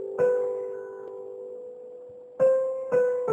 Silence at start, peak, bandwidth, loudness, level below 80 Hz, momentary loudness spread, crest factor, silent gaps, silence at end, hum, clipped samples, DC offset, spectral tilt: 0 s; -14 dBFS; 8 kHz; -26 LUFS; -72 dBFS; 20 LU; 14 dB; none; 0 s; none; under 0.1%; under 0.1%; -7.5 dB/octave